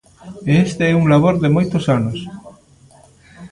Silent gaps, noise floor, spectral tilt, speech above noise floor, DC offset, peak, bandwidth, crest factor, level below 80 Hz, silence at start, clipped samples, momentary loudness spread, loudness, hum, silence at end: none; -48 dBFS; -7.5 dB/octave; 33 dB; under 0.1%; -2 dBFS; 11 kHz; 16 dB; -46 dBFS; 0.25 s; under 0.1%; 14 LU; -16 LUFS; none; 0.05 s